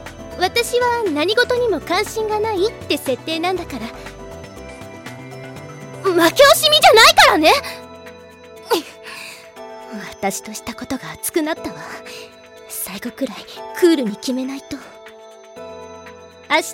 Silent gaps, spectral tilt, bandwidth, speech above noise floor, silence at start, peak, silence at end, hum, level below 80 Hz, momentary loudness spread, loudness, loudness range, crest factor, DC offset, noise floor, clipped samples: none; -2.5 dB/octave; 17 kHz; 23 dB; 0 s; -2 dBFS; 0 s; none; -48 dBFS; 25 LU; -16 LUFS; 14 LU; 18 dB; under 0.1%; -40 dBFS; under 0.1%